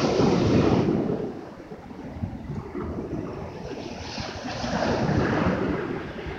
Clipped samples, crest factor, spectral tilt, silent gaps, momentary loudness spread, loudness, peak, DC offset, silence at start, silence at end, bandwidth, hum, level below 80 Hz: under 0.1%; 18 dB; -6.5 dB/octave; none; 15 LU; -26 LUFS; -8 dBFS; under 0.1%; 0 s; 0 s; 8 kHz; none; -44 dBFS